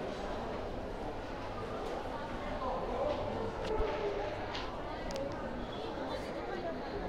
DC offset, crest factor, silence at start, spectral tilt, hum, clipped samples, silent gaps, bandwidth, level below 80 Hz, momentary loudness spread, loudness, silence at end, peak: under 0.1%; 16 dB; 0 s; -6 dB/octave; none; under 0.1%; none; 15.5 kHz; -46 dBFS; 6 LU; -39 LUFS; 0 s; -20 dBFS